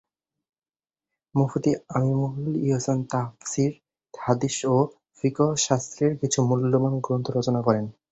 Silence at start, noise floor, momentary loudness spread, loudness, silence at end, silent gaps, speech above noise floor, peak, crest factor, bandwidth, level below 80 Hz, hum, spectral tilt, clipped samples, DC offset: 1.35 s; under -90 dBFS; 6 LU; -25 LUFS; 0.2 s; none; over 66 dB; -6 dBFS; 20 dB; 8.4 kHz; -60 dBFS; none; -6 dB/octave; under 0.1%; under 0.1%